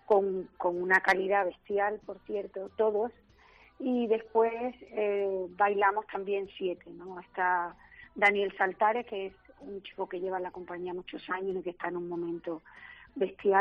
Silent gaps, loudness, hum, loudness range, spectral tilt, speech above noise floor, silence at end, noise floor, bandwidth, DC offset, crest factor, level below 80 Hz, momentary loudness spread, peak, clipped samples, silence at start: none; -31 LUFS; none; 7 LU; -3 dB/octave; 29 dB; 0 s; -59 dBFS; 7.6 kHz; under 0.1%; 20 dB; -68 dBFS; 16 LU; -12 dBFS; under 0.1%; 0.1 s